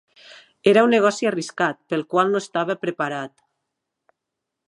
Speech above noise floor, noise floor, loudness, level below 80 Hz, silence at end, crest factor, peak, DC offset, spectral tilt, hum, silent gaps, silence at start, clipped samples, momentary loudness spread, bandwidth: 62 dB; -82 dBFS; -21 LUFS; -74 dBFS; 1.4 s; 20 dB; -2 dBFS; under 0.1%; -5 dB/octave; none; none; 0.3 s; under 0.1%; 11 LU; 11.5 kHz